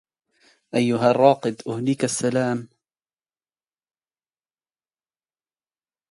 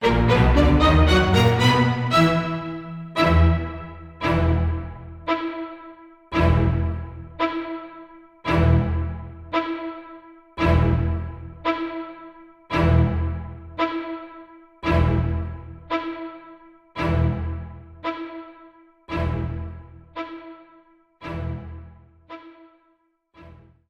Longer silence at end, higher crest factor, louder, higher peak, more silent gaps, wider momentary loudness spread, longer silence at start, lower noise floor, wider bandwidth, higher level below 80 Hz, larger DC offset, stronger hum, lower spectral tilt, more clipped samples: first, 3.45 s vs 0.4 s; about the same, 24 dB vs 20 dB; about the same, -21 LUFS vs -22 LUFS; about the same, -2 dBFS vs -4 dBFS; neither; second, 11 LU vs 23 LU; first, 0.75 s vs 0 s; first, under -90 dBFS vs -65 dBFS; about the same, 11.5 kHz vs 11 kHz; second, -70 dBFS vs -30 dBFS; neither; neither; second, -5.5 dB/octave vs -7 dB/octave; neither